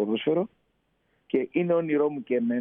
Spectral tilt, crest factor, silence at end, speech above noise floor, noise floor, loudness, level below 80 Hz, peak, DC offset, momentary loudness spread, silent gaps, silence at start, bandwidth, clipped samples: -10.5 dB/octave; 16 dB; 0 s; 45 dB; -71 dBFS; -27 LUFS; -74 dBFS; -12 dBFS; under 0.1%; 5 LU; none; 0 s; 3.7 kHz; under 0.1%